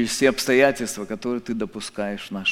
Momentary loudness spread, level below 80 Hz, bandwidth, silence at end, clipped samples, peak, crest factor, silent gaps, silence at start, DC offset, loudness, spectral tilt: 11 LU; -52 dBFS; 16.5 kHz; 0 s; under 0.1%; -2 dBFS; 20 dB; none; 0 s; under 0.1%; -23 LUFS; -3.5 dB/octave